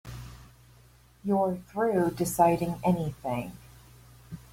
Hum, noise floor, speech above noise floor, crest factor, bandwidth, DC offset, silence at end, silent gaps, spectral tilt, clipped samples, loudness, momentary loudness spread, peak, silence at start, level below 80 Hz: none; -57 dBFS; 30 dB; 20 dB; 16.5 kHz; under 0.1%; 0.15 s; none; -6.5 dB/octave; under 0.1%; -28 LUFS; 21 LU; -10 dBFS; 0.05 s; -54 dBFS